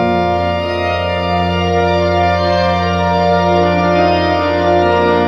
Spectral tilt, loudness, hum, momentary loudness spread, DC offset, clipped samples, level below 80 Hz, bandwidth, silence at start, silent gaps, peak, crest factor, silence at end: -7 dB/octave; -13 LUFS; none; 4 LU; under 0.1%; under 0.1%; -40 dBFS; 7.6 kHz; 0 s; none; 0 dBFS; 12 dB; 0 s